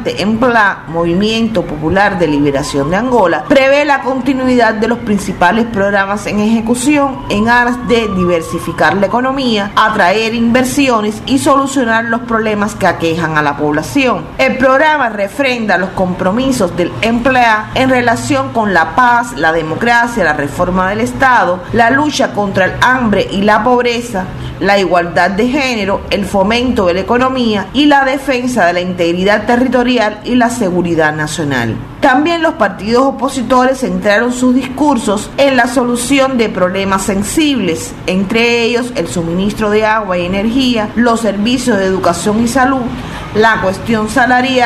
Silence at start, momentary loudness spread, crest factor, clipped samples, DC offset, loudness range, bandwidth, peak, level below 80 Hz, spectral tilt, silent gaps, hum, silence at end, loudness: 0 s; 5 LU; 12 dB; under 0.1%; under 0.1%; 1 LU; 14 kHz; 0 dBFS; -34 dBFS; -5 dB/octave; none; none; 0 s; -12 LUFS